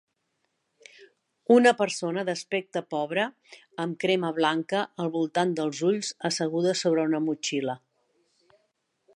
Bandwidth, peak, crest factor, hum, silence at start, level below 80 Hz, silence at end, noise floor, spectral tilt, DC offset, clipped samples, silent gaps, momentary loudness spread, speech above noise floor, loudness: 11.5 kHz; -6 dBFS; 22 dB; none; 1 s; -80 dBFS; 1.4 s; -77 dBFS; -4.5 dB/octave; under 0.1%; under 0.1%; none; 10 LU; 51 dB; -26 LUFS